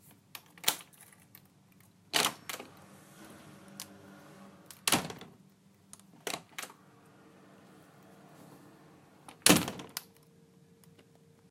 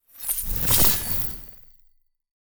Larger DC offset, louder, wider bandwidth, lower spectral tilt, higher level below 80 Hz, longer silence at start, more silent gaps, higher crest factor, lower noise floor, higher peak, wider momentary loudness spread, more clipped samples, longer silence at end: neither; second, -31 LUFS vs -20 LUFS; second, 16 kHz vs over 20 kHz; about the same, -2 dB/octave vs -2 dB/octave; second, -70 dBFS vs -38 dBFS; first, 0.35 s vs 0 s; neither; first, 36 dB vs 22 dB; about the same, -62 dBFS vs -60 dBFS; about the same, -4 dBFS vs -4 dBFS; first, 28 LU vs 16 LU; neither; first, 1.5 s vs 0.2 s